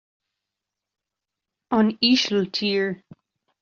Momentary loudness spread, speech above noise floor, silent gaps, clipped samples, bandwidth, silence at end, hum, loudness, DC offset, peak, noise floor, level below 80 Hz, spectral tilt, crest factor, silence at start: 9 LU; 64 dB; none; under 0.1%; 7.4 kHz; 0.65 s; none; -21 LUFS; under 0.1%; -6 dBFS; -86 dBFS; -66 dBFS; -3 dB/octave; 20 dB; 1.7 s